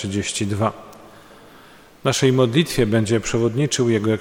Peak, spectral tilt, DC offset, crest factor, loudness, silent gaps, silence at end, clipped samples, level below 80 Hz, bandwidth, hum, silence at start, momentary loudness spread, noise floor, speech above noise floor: -4 dBFS; -5 dB/octave; 0.1%; 16 dB; -20 LUFS; none; 0 s; under 0.1%; -46 dBFS; 17 kHz; none; 0 s; 6 LU; -47 dBFS; 28 dB